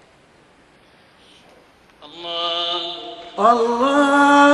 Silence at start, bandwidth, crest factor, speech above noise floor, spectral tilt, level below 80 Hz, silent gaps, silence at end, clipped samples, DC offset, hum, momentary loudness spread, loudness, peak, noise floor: 2.15 s; 11 kHz; 18 dB; 37 dB; -3 dB/octave; -62 dBFS; none; 0 s; under 0.1%; under 0.1%; none; 18 LU; -17 LUFS; -2 dBFS; -52 dBFS